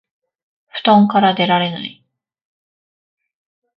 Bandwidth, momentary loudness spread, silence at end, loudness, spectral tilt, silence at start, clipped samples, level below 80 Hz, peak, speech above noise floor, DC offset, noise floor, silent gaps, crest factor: 5.4 kHz; 18 LU; 1.85 s; -14 LUFS; -8.5 dB/octave; 0.75 s; under 0.1%; -62 dBFS; 0 dBFS; over 76 dB; under 0.1%; under -90 dBFS; none; 18 dB